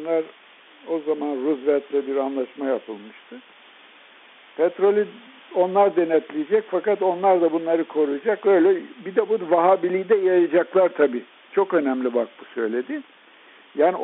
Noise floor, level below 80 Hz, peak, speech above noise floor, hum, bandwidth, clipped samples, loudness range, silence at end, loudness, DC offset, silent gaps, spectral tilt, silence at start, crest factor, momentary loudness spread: -50 dBFS; -74 dBFS; -6 dBFS; 29 dB; none; 4 kHz; under 0.1%; 7 LU; 0 s; -22 LUFS; under 0.1%; none; -4.5 dB/octave; 0 s; 16 dB; 11 LU